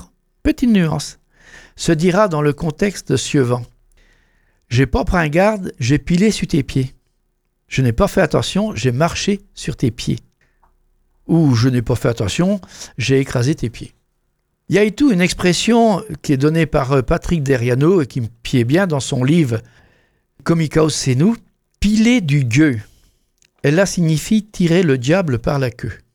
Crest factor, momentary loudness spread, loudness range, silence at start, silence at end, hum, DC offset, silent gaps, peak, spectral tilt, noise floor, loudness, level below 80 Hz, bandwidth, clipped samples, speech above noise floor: 16 dB; 9 LU; 3 LU; 0 s; 0.2 s; none; under 0.1%; none; 0 dBFS; -6 dB/octave; -67 dBFS; -17 LUFS; -36 dBFS; 17 kHz; under 0.1%; 51 dB